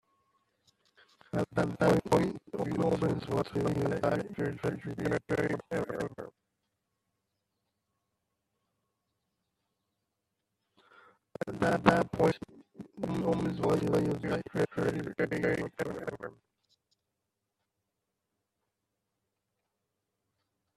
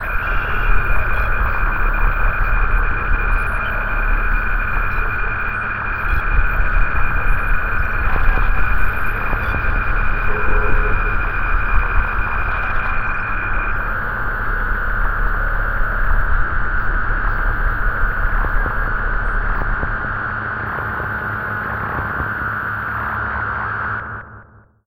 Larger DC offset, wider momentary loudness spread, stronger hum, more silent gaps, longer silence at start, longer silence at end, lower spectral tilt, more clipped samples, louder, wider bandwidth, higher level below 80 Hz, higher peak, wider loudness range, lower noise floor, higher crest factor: neither; first, 13 LU vs 3 LU; neither; neither; first, 1.35 s vs 0 s; first, 4.45 s vs 0 s; about the same, -7 dB/octave vs -7.5 dB/octave; neither; second, -32 LUFS vs -20 LUFS; about the same, 13.5 kHz vs 13.5 kHz; second, -60 dBFS vs -20 dBFS; second, -6 dBFS vs 0 dBFS; first, 11 LU vs 2 LU; first, -85 dBFS vs -44 dBFS; first, 28 dB vs 16 dB